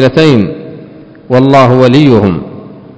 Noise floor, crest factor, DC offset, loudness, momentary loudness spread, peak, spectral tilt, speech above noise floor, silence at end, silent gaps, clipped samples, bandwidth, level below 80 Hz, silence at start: -31 dBFS; 8 dB; under 0.1%; -7 LUFS; 19 LU; 0 dBFS; -7.5 dB/octave; 25 dB; 0.2 s; none; 7%; 8 kHz; -36 dBFS; 0 s